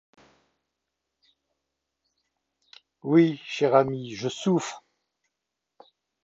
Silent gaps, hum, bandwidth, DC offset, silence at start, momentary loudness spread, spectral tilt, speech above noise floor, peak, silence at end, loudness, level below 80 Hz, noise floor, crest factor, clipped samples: none; none; 8 kHz; under 0.1%; 3.05 s; 16 LU; -6 dB/octave; 61 dB; -6 dBFS; 1.45 s; -24 LUFS; -72 dBFS; -84 dBFS; 22 dB; under 0.1%